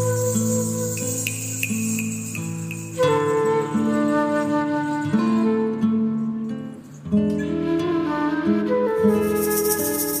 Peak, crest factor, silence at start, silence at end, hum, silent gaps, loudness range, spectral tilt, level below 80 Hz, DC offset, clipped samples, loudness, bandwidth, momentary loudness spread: -6 dBFS; 16 dB; 0 s; 0 s; none; none; 2 LU; -5 dB/octave; -54 dBFS; under 0.1%; under 0.1%; -22 LUFS; 15.5 kHz; 8 LU